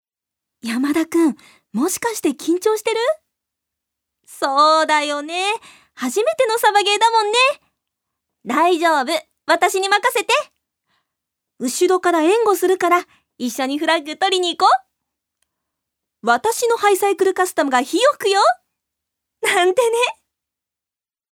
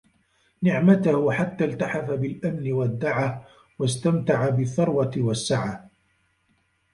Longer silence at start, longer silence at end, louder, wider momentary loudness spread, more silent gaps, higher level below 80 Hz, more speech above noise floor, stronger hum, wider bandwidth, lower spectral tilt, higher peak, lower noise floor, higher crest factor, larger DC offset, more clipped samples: about the same, 0.65 s vs 0.6 s; first, 1.2 s vs 1.05 s; first, -17 LUFS vs -24 LUFS; about the same, 10 LU vs 9 LU; neither; second, -72 dBFS vs -58 dBFS; first, over 73 dB vs 45 dB; neither; first, 19 kHz vs 11.5 kHz; second, -1.5 dB/octave vs -6.5 dB/octave; first, -2 dBFS vs -6 dBFS; first, under -90 dBFS vs -68 dBFS; about the same, 18 dB vs 18 dB; neither; neither